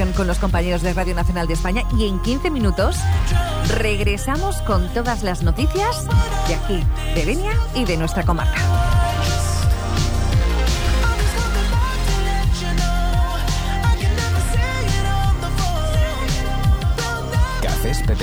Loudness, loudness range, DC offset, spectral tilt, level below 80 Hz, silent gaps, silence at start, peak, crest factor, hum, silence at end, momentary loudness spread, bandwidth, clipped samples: -20 LUFS; 1 LU; under 0.1%; -5 dB/octave; -20 dBFS; none; 0 s; -6 dBFS; 12 dB; none; 0 s; 3 LU; over 20 kHz; under 0.1%